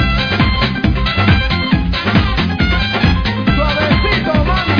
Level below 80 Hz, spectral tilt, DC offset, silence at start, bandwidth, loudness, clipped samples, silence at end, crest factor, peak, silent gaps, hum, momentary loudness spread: -20 dBFS; -7 dB/octave; under 0.1%; 0 s; 5.4 kHz; -14 LUFS; under 0.1%; 0 s; 14 dB; 0 dBFS; none; none; 3 LU